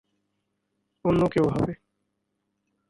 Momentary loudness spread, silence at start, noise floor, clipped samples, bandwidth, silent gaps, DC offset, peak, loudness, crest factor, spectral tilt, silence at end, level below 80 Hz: 8 LU; 1.05 s; -78 dBFS; under 0.1%; 11.5 kHz; none; under 0.1%; -10 dBFS; -25 LUFS; 18 dB; -8.5 dB/octave; 1.15 s; -52 dBFS